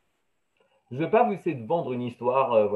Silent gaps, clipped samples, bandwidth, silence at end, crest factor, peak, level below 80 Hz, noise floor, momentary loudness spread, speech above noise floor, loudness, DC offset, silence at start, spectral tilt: none; under 0.1%; 4.3 kHz; 0 s; 18 dB; -8 dBFS; -76 dBFS; -76 dBFS; 10 LU; 52 dB; -26 LUFS; under 0.1%; 0.9 s; -8.5 dB/octave